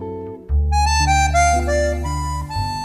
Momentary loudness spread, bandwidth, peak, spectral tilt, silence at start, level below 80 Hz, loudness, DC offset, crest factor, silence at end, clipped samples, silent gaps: 9 LU; 14 kHz; -4 dBFS; -4.5 dB/octave; 0 s; -22 dBFS; -18 LUFS; under 0.1%; 14 dB; 0 s; under 0.1%; none